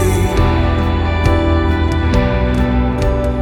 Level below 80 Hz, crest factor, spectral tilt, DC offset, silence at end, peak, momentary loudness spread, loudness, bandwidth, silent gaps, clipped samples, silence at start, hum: -18 dBFS; 12 dB; -7 dB/octave; under 0.1%; 0 s; 0 dBFS; 2 LU; -15 LUFS; 13.5 kHz; none; under 0.1%; 0 s; none